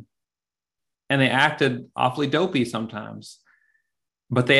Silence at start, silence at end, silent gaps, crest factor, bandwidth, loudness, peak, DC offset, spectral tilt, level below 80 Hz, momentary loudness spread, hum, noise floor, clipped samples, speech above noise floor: 1.1 s; 0 s; none; 22 dB; 12.5 kHz; -22 LUFS; -2 dBFS; under 0.1%; -5.5 dB/octave; -64 dBFS; 15 LU; none; under -90 dBFS; under 0.1%; over 68 dB